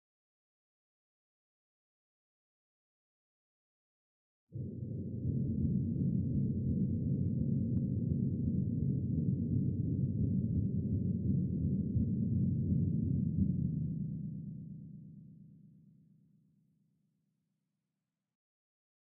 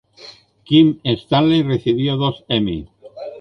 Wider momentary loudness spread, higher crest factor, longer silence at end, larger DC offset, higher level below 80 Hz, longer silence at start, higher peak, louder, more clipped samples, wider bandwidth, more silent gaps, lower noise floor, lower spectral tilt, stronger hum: about the same, 11 LU vs 13 LU; about the same, 16 dB vs 16 dB; first, 3.4 s vs 0 s; neither; second, -52 dBFS vs -46 dBFS; first, 4.5 s vs 0.2 s; second, -20 dBFS vs -2 dBFS; second, -35 LUFS vs -17 LUFS; neither; second, 0.8 kHz vs 6.2 kHz; neither; first, -89 dBFS vs -43 dBFS; first, -12.5 dB/octave vs -8 dB/octave; neither